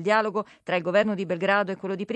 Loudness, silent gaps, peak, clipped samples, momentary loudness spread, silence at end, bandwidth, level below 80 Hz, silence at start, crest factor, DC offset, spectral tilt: -25 LUFS; none; -8 dBFS; under 0.1%; 7 LU; 0 s; 8.8 kHz; -72 dBFS; 0 s; 16 dB; under 0.1%; -6 dB/octave